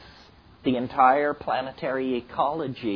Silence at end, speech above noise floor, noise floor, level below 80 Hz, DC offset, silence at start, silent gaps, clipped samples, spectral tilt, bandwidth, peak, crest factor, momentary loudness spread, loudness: 0 s; 27 dB; -52 dBFS; -58 dBFS; under 0.1%; 0 s; none; under 0.1%; -8 dB/octave; 5.4 kHz; -6 dBFS; 20 dB; 10 LU; -25 LUFS